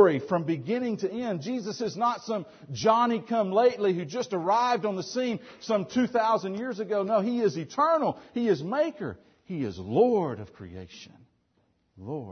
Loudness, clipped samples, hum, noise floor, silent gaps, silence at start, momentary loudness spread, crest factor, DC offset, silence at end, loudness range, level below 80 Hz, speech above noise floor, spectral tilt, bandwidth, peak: -27 LUFS; under 0.1%; none; -70 dBFS; none; 0 s; 15 LU; 20 dB; under 0.1%; 0 s; 3 LU; -68 dBFS; 43 dB; -6 dB/octave; 6.6 kHz; -6 dBFS